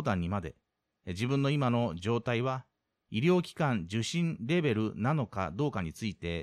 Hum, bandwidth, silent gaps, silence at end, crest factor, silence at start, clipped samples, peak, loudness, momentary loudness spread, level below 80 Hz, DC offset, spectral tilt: none; 13 kHz; none; 0 s; 16 dB; 0 s; under 0.1%; -16 dBFS; -31 LUFS; 9 LU; -58 dBFS; under 0.1%; -6.5 dB/octave